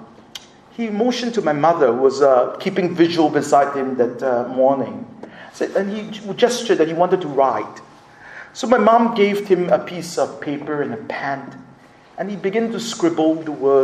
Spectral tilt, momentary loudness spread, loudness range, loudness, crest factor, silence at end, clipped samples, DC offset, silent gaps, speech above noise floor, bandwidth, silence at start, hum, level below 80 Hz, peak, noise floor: -5.5 dB/octave; 18 LU; 6 LU; -18 LUFS; 18 dB; 0 s; under 0.1%; under 0.1%; none; 28 dB; 14.5 kHz; 0 s; none; -64 dBFS; 0 dBFS; -46 dBFS